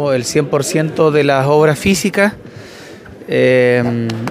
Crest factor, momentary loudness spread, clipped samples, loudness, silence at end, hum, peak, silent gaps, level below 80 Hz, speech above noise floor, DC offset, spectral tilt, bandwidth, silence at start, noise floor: 14 dB; 22 LU; under 0.1%; -13 LUFS; 0 s; none; 0 dBFS; none; -46 dBFS; 21 dB; under 0.1%; -5.5 dB/octave; 16 kHz; 0 s; -34 dBFS